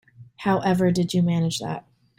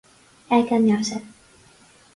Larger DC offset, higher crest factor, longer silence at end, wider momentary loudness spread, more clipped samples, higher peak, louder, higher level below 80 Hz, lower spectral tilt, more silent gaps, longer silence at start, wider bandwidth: neither; about the same, 16 dB vs 18 dB; second, 0.4 s vs 0.85 s; about the same, 10 LU vs 11 LU; neither; second, -8 dBFS vs -4 dBFS; about the same, -23 LUFS vs -21 LUFS; first, -58 dBFS vs -64 dBFS; about the same, -6 dB/octave vs -5.5 dB/octave; neither; second, 0.2 s vs 0.5 s; first, 15 kHz vs 11.5 kHz